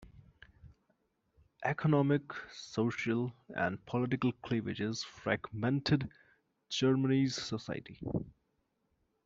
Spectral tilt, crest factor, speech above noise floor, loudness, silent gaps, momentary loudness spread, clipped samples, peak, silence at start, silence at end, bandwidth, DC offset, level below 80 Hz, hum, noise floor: -6 dB/octave; 20 dB; 46 dB; -34 LUFS; none; 11 LU; under 0.1%; -16 dBFS; 0 s; 0.95 s; 7.8 kHz; under 0.1%; -64 dBFS; none; -79 dBFS